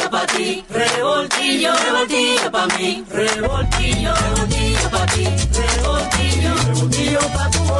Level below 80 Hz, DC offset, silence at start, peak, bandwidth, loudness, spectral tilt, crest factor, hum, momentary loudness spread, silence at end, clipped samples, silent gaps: -26 dBFS; under 0.1%; 0 s; -4 dBFS; 12.5 kHz; -17 LUFS; -3.5 dB/octave; 14 dB; none; 4 LU; 0 s; under 0.1%; none